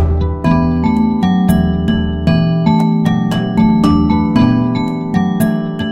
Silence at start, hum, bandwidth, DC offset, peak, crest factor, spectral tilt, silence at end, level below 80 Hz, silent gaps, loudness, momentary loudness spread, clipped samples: 0 s; none; 15.5 kHz; 0.6%; 0 dBFS; 12 dB; -8 dB/octave; 0 s; -26 dBFS; none; -13 LUFS; 4 LU; under 0.1%